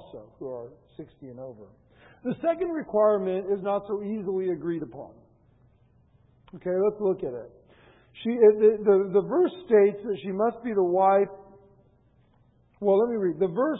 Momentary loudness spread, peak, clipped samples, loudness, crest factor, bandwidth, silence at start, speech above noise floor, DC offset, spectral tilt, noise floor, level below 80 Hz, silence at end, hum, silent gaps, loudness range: 21 LU; -8 dBFS; under 0.1%; -25 LUFS; 18 dB; 3.9 kHz; 0 s; 37 dB; under 0.1%; -11 dB/octave; -62 dBFS; -66 dBFS; 0 s; none; none; 9 LU